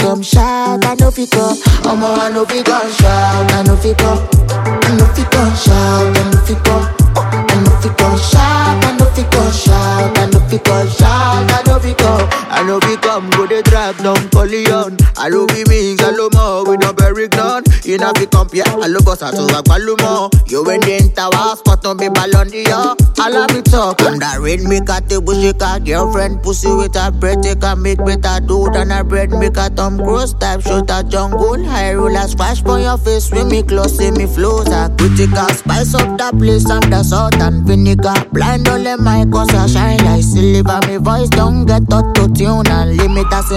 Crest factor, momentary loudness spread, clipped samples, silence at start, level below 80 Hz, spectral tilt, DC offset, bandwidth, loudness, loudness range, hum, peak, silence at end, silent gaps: 10 dB; 4 LU; under 0.1%; 0 s; -16 dBFS; -5.5 dB/octave; under 0.1%; 16.5 kHz; -12 LUFS; 3 LU; none; 0 dBFS; 0 s; none